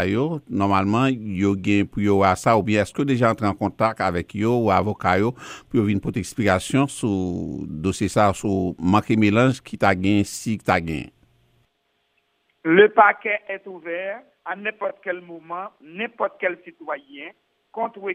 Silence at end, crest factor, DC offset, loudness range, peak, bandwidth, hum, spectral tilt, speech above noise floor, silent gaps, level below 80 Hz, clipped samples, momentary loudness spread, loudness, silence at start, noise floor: 0 s; 22 dB; under 0.1%; 9 LU; 0 dBFS; 15.5 kHz; none; -6 dB/octave; 49 dB; none; -52 dBFS; under 0.1%; 15 LU; -21 LUFS; 0 s; -70 dBFS